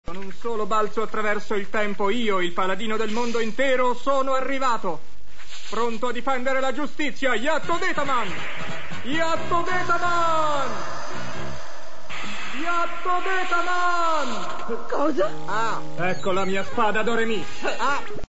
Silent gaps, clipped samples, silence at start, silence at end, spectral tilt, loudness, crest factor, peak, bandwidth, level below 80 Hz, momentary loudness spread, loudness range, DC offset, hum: none; under 0.1%; 0 s; 0 s; -4 dB/octave; -25 LUFS; 16 dB; -8 dBFS; 8 kHz; -52 dBFS; 11 LU; 2 LU; 9%; none